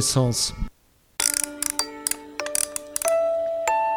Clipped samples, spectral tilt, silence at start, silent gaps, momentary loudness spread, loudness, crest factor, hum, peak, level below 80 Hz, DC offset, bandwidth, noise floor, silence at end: under 0.1%; -3 dB/octave; 0 s; none; 7 LU; -24 LUFS; 22 dB; none; -4 dBFS; -42 dBFS; under 0.1%; over 20 kHz; -58 dBFS; 0 s